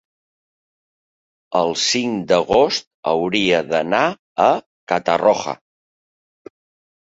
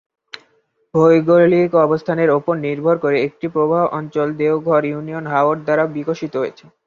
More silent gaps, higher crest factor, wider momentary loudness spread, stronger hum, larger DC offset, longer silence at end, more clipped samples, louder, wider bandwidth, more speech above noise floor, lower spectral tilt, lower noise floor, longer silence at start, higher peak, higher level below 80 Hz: first, 2.87-3.03 s, 4.19-4.36 s, 4.66-4.87 s vs none; about the same, 18 dB vs 16 dB; second, 7 LU vs 11 LU; neither; neither; first, 1.45 s vs 0.35 s; neither; about the same, -18 LUFS vs -17 LUFS; first, 8 kHz vs 7 kHz; first, over 73 dB vs 44 dB; second, -3.5 dB/octave vs -8.5 dB/octave; first, under -90 dBFS vs -60 dBFS; first, 1.5 s vs 0.95 s; about the same, -2 dBFS vs -2 dBFS; about the same, -56 dBFS vs -60 dBFS